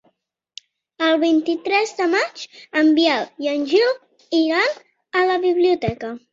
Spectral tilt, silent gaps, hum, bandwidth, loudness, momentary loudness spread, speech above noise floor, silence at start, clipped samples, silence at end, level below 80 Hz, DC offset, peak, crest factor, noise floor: -4.5 dB/octave; none; none; 7.6 kHz; -19 LUFS; 9 LU; 49 dB; 1 s; under 0.1%; 0.15 s; -56 dBFS; under 0.1%; -4 dBFS; 16 dB; -67 dBFS